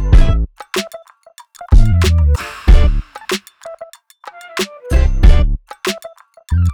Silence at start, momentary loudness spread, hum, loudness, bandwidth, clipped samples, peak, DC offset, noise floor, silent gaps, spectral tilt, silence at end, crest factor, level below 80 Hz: 0 s; 22 LU; none; -16 LUFS; 16 kHz; 0.4%; 0 dBFS; under 0.1%; -44 dBFS; none; -5.5 dB/octave; 0 s; 12 dB; -14 dBFS